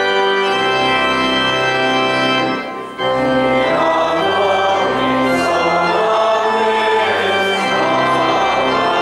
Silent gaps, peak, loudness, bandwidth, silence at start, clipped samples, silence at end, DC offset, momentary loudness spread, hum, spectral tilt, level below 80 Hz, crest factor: none; -4 dBFS; -14 LUFS; 13.5 kHz; 0 s; under 0.1%; 0 s; under 0.1%; 1 LU; none; -4 dB/octave; -48 dBFS; 10 dB